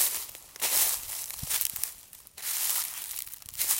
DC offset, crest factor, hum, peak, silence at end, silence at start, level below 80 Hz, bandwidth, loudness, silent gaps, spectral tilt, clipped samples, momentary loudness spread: under 0.1%; 28 dB; none; -4 dBFS; 0 s; 0 s; -60 dBFS; 17 kHz; -29 LUFS; none; 1.5 dB/octave; under 0.1%; 14 LU